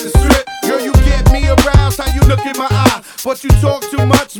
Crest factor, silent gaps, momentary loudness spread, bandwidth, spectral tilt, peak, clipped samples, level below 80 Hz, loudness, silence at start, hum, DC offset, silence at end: 10 dB; none; 6 LU; 19.5 kHz; -5.5 dB/octave; 0 dBFS; 0.3%; -14 dBFS; -13 LUFS; 0 s; none; under 0.1%; 0 s